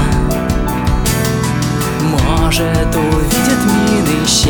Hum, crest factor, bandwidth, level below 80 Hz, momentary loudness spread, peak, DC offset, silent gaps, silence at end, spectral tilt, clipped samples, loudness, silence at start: none; 12 dB; over 20 kHz; -20 dBFS; 4 LU; 0 dBFS; under 0.1%; none; 0 s; -4.5 dB/octave; under 0.1%; -14 LUFS; 0 s